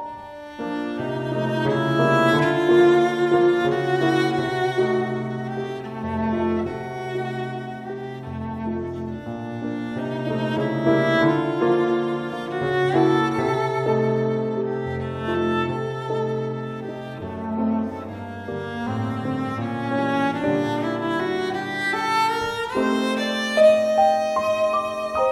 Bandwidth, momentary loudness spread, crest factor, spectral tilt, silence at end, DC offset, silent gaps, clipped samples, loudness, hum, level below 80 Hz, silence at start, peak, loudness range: 12.5 kHz; 13 LU; 16 dB; -6.5 dB/octave; 0 s; under 0.1%; none; under 0.1%; -23 LUFS; none; -54 dBFS; 0 s; -6 dBFS; 9 LU